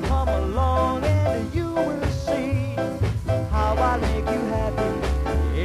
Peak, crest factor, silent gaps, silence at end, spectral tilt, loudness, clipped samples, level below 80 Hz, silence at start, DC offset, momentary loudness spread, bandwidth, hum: -10 dBFS; 12 dB; none; 0 s; -7 dB/octave; -24 LUFS; under 0.1%; -28 dBFS; 0 s; under 0.1%; 4 LU; 13 kHz; none